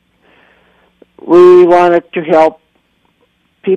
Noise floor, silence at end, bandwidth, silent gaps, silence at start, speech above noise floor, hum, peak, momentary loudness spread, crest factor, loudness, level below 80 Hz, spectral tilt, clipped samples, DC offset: -57 dBFS; 0 s; 6.6 kHz; none; 1.25 s; 51 dB; none; 0 dBFS; 10 LU; 10 dB; -7 LUFS; -54 dBFS; -7.5 dB/octave; under 0.1%; under 0.1%